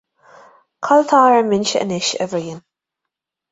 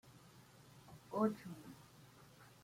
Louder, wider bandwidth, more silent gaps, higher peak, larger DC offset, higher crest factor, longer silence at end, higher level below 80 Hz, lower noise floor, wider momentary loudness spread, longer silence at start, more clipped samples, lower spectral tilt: first, -16 LUFS vs -42 LUFS; second, 8.2 kHz vs 16.5 kHz; neither; first, -2 dBFS vs -22 dBFS; neither; second, 16 dB vs 24 dB; first, 0.9 s vs 0.15 s; first, -62 dBFS vs -78 dBFS; first, -82 dBFS vs -63 dBFS; second, 17 LU vs 24 LU; first, 0.8 s vs 0.05 s; neither; second, -4 dB/octave vs -7 dB/octave